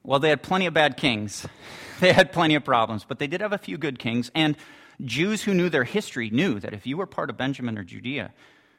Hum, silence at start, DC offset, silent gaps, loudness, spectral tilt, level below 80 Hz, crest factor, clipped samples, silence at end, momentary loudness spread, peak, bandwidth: none; 0.05 s; under 0.1%; none; -24 LUFS; -5 dB/octave; -58 dBFS; 20 dB; under 0.1%; 0.5 s; 14 LU; -4 dBFS; 16 kHz